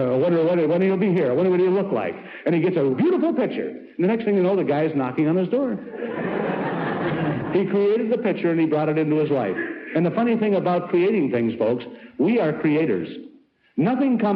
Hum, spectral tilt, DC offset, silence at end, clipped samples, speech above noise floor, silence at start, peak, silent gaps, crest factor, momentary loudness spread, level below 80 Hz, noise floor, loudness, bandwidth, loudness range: none; -10.5 dB/octave; under 0.1%; 0 s; under 0.1%; 30 dB; 0 s; -10 dBFS; none; 10 dB; 8 LU; -64 dBFS; -51 dBFS; -22 LUFS; 5.2 kHz; 2 LU